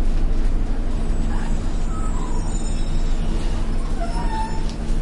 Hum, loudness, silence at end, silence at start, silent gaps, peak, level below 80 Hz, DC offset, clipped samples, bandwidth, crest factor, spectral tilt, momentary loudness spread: none; -27 LUFS; 0 s; 0 s; none; -10 dBFS; -20 dBFS; under 0.1%; under 0.1%; 10 kHz; 10 dB; -6 dB/octave; 2 LU